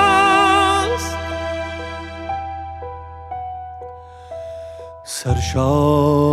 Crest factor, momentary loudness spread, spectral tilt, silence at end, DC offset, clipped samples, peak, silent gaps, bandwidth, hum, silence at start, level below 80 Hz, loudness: 16 dB; 22 LU; -5 dB/octave; 0 s; under 0.1%; under 0.1%; -2 dBFS; none; 15 kHz; none; 0 s; -40 dBFS; -18 LUFS